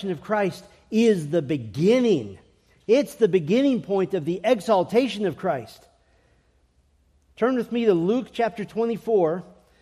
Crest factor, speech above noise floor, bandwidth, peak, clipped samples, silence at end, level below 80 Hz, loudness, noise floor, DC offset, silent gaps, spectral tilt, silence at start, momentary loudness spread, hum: 16 dB; 40 dB; 14 kHz; -8 dBFS; under 0.1%; 0.4 s; -62 dBFS; -23 LUFS; -63 dBFS; under 0.1%; none; -6.5 dB/octave; 0 s; 8 LU; none